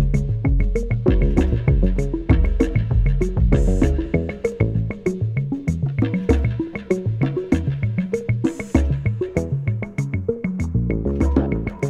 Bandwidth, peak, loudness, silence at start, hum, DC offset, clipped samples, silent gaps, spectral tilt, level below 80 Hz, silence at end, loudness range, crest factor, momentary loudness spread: 9.4 kHz; -2 dBFS; -21 LUFS; 0 s; none; under 0.1%; under 0.1%; none; -8.5 dB/octave; -24 dBFS; 0 s; 3 LU; 16 dB; 5 LU